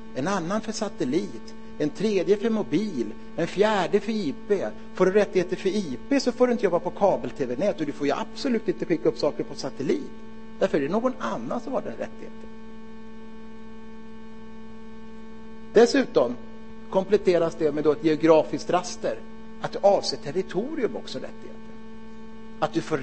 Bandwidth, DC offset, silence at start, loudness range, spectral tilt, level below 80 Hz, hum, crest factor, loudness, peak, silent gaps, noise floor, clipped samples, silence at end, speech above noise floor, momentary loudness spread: 8.8 kHz; 1%; 0 s; 8 LU; -5.5 dB/octave; -56 dBFS; 60 Hz at -55 dBFS; 22 dB; -25 LUFS; -4 dBFS; none; -44 dBFS; under 0.1%; 0 s; 19 dB; 23 LU